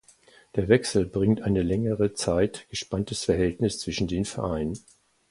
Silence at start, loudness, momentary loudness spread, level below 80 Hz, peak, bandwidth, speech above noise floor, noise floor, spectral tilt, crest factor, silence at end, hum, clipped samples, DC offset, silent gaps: 0.55 s; -26 LUFS; 9 LU; -44 dBFS; -4 dBFS; 11.5 kHz; 31 dB; -57 dBFS; -5.5 dB/octave; 22 dB; 0.5 s; none; under 0.1%; under 0.1%; none